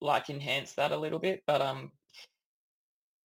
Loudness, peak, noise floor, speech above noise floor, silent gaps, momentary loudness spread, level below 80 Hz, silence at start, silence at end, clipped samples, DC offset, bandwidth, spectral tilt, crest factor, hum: -32 LUFS; -14 dBFS; -57 dBFS; 26 dB; none; 6 LU; -78 dBFS; 0 s; 1 s; under 0.1%; under 0.1%; 16.5 kHz; -4.5 dB/octave; 20 dB; none